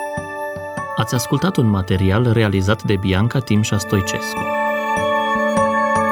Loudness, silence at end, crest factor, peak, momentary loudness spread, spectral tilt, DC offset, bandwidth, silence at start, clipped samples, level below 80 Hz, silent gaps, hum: -18 LUFS; 0 s; 16 dB; -2 dBFS; 9 LU; -5.5 dB/octave; under 0.1%; 17.5 kHz; 0 s; under 0.1%; -44 dBFS; none; none